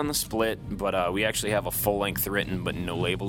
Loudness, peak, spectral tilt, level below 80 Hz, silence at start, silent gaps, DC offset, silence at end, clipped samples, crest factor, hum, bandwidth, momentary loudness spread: -27 LUFS; -8 dBFS; -4 dB/octave; -44 dBFS; 0 s; none; under 0.1%; 0 s; under 0.1%; 20 dB; none; 18 kHz; 5 LU